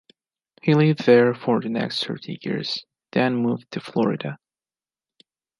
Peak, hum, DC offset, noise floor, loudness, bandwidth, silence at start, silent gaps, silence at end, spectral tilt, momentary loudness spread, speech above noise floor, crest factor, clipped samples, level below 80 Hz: -2 dBFS; none; under 0.1%; under -90 dBFS; -22 LUFS; 11.5 kHz; 0.65 s; none; 1.25 s; -7 dB/octave; 14 LU; over 69 dB; 20 dB; under 0.1%; -70 dBFS